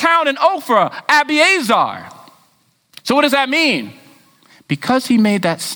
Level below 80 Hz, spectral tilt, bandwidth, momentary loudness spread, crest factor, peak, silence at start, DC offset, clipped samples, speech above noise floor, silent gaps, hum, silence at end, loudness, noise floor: -64 dBFS; -4 dB/octave; over 20 kHz; 10 LU; 16 dB; 0 dBFS; 0 s; under 0.1%; under 0.1%; 43 dB; none; none; 0 s; -14 LUFS; -58 dBFS